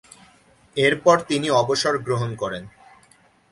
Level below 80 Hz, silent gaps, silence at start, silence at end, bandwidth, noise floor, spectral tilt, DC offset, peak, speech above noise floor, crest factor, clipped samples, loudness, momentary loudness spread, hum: -58 dBFS; none; 0.75 s; 0.8 s; 11.5 kHz; -56 dBFS; -4.5 dB/octave; under 0.1%; -2 dBFS; 36 dB; 20 dB; under 0.1%; -21 LUFS; 12 LU; none